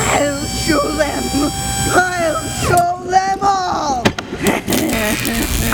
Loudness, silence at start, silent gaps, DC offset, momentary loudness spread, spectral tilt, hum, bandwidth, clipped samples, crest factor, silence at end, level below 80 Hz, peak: -16 LUFS; 0 s; none; under 0.1%; 4 LU; -3.5 dB/octave; none; over 20 kHz; under 0.1%; 16 dB; 0 s; -30 dBFS; 0 dBFS